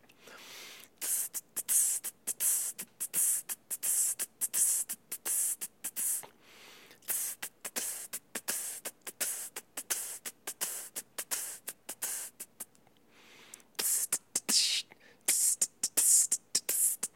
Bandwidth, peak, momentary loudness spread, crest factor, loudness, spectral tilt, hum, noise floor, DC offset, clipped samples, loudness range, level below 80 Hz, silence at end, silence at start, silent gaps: 17 kHz; -12 dBFS; 16 LU; 24 dB; -31 LUFS; 2 dB/octave; none; -65 dBFS; under 0.1%; under 0.1%; 10 LU; -86 dBFS; 0.1 s; 0.25 s; none